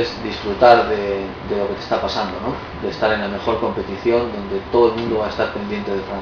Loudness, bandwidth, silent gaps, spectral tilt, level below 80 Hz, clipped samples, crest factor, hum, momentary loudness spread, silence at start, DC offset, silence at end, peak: -19 LUFS; 5.4 kHz; none; -6.5 dB/octave; -40 dBFS; under 0.1%; 20 dB; none; 11 LU; 0 s; under 0.1%; 0 s; 0 dBFS